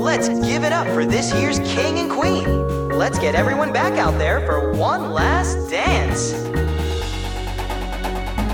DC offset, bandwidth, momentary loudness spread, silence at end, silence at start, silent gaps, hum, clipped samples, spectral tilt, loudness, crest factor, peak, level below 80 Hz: under 0.1%; 18 kHz; 8 LU; 0 s; 0 s; none; none; under 0.1%; -5 dB/octave; -20 LUFS; 16 dB; -4 dBFS; -28 dBFS